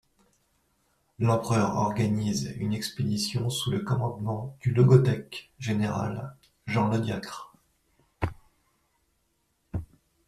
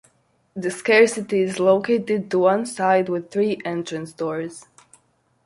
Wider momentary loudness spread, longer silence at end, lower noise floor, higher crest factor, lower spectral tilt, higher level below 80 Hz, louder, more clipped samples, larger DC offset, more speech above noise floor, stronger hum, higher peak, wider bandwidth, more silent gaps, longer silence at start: first, 16 LU vs 13 LU; second, 0.45 s vs 0.85 s; first, -73 dBFS vs -63 dBFS; about the same, 22 dB vs 20 dB; first, -6.5 dB/octave vs -5 dB/octave; first, -54 dBFS vs -66 dBFS; second, -27 LUFS vs -21 LUFS; neither; neither; first, 47 dB vs 43 dB; neither; second, -6 dBFS vs -2 dBFS; first, 13.5 kHz vs 11.5 kHz; neither; first, 1.2 s vs 0.55 s